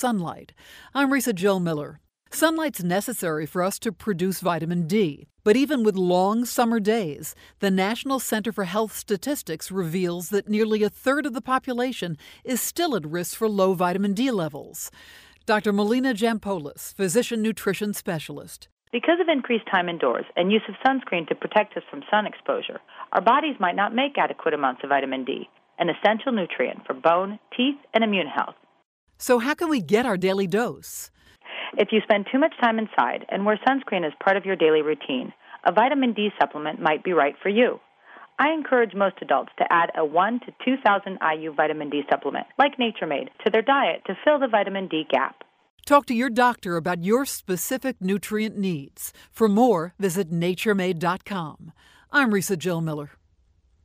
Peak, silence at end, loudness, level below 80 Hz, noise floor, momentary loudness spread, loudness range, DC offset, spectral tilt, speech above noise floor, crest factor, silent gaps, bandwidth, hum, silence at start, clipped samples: -4 dBFS; 0.75 s; -23 LUFS; -64 dBFS; -62 dBFS; 10 LU; 3 LU; under 0.1%; -4.5 dB/octave; 39 dB; 20 dB; 18.72-18.77 s, 28.85-29.07 s, 45.70-45.78 s; 16 kHz; none; 0 s; under 0.1%